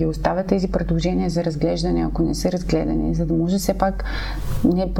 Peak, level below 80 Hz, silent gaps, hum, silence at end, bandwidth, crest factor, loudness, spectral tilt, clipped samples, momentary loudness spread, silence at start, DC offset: -4 dBFS; -28 dBFS; none; none; 0 s; 17.5 kHz; 16 dB; -22 LUFS; -6.5 dB/octave; under 0.1%; 3 LU; 0 s; under 0.1%